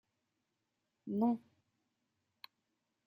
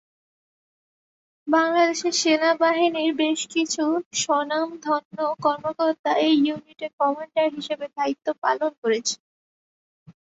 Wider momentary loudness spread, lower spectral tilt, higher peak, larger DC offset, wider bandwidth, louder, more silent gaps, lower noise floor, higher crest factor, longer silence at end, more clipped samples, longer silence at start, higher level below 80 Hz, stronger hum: first, 23 LU vs 7 LU; first, -9.5 dB/octave vs -2.5 dB/octave; second, -22 dBFS vs -8 dBFS; neither; first, 14.5 kHz vs 8.2 kHz; second, -37 LUFS vs -23 LUFS; second, none vs 4.06-4.11 s, 5.05-5.11 s, 5.99-6.04 s, 6.93-6.98 s, 8.38-8.42 s, 8.78-8.82 s, 9.20-10.06 s; second, -86 dBFS vs under -90 dBFS; about the same, 20 dB vs 16 dB; first, 1.7 s vs 0.2 s; neither; second, 1.05 s vs 1.45 s; second, under -90 dBFS vs -72 dBFS; neither